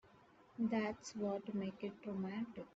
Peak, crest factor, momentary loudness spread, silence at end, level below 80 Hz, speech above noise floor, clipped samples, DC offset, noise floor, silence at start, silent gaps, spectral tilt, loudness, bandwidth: -28 dBFS; 16 dB; 7 LU; 0.05 s; -78 dBFS; 24 dB; under 0.1%; under 0.1%; -66 dBFS; 0.05 s; none; -6 dB/octave; -43 LUFS; 8 kHz